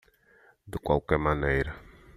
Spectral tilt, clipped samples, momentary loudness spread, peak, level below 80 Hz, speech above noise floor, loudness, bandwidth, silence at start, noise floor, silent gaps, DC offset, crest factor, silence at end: -8 dB/octave; under 0.1%; 14 LU; -10 dBFS; -42 dBFS; 34 dB; -28 LUFS; 14.5 kHz; 0.65 s; -61 dBFS; none; under 0.1%; 20 dB; 0.35 s